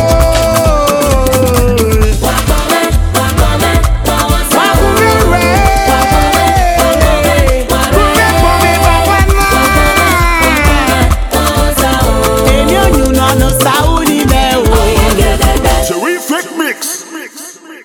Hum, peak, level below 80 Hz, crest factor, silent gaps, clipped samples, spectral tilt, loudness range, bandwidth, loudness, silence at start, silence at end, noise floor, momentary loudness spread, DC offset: none; 0 dBFS; -14 dBFS; 8 dB; none; 0.3%; -4.5 dB/octave; 2 LU; over 20 kHz; -9 LUFS; 0 s; 0 s; -29 dBFS; 4 LU; under 0.1%